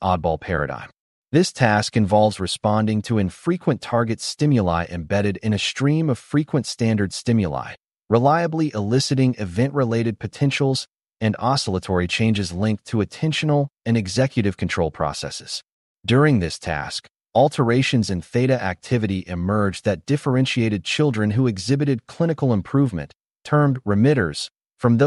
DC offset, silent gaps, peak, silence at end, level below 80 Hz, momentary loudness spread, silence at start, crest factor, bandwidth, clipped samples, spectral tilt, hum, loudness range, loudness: under 0.1%; 1.00-1.23 s, 15.72-15.96 s, 17.11-17.15 s, 23.26-23.30 s; -4 dBFS; 0 s; -48 dBFS; 8 LU; 0 s; 16 dB; 11.5 kHz; under 0.1%; -6 dB/octave; none; 2 LU; -21 LUFS